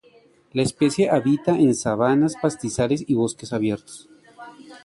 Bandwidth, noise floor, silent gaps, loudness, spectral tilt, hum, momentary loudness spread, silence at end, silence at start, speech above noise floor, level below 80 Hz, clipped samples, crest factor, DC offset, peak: 11.5 kHz; -55 dBFS; none; -21 LUFS; -6 dB/octave; none; 11 LU; 0.05 s; 0.55 s; 34 dB; -54 dBFS; under 0.1%; 16 dB; under 0.1%; -6 dBFS